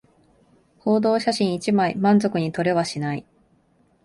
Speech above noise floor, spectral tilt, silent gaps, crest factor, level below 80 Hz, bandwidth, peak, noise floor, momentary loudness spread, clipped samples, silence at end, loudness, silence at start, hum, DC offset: 41 dB; -6 dB/octave; none; 16 dB; -62 dBFS; 11.5 kHz; -8 dBFS; -61 dBFS; 10 LU; under 0.1%; 0.85 s; -21 LUFS; 0.85 s; none; under 0.1%